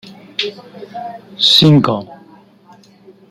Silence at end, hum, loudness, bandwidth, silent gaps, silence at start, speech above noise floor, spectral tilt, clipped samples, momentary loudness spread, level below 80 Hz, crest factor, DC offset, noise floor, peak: 1.15 s; none; -12 LUFS; 13.5 kHz; none; 0.05 s; 31 dB; -5.5 dB/octave; under 0.1%; 22 LU; -54 dBFS; 16 dB; under 0.1%; -45 dBFS; 0 dBFS